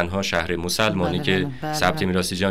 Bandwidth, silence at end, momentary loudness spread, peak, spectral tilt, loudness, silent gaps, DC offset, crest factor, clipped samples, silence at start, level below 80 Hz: 16 kHz; 0 s; 3 LU; -6 dBFS; -4.5 dB/octave; -22 LUFS; none; under 0.1%; 16 dB; under 0.1%; 0 s; -46 dBFS